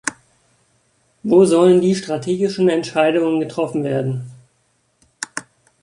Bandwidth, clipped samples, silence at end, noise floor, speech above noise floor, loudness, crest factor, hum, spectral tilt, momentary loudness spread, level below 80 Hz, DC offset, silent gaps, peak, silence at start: 11.5 kHz; under 0.1%; 0.4 s; -64 dBFS; 48 dB; -17 LUFS; 16 dB; none; -6 dB/octave; 16 LU; -62 dBFS; under 0.1%; none; -2 dBFS; 0.05 s